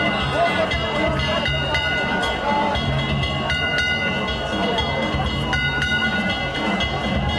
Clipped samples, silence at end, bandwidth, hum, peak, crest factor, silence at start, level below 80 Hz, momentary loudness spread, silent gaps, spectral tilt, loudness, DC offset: under 0.1%; 0 s; 12.5 kHz; none; -8 dBFS; 14 dB; 0 s; -32 dBFS; 3 LU; none; -5 dB/octave; -20 LUFS; under 0.1%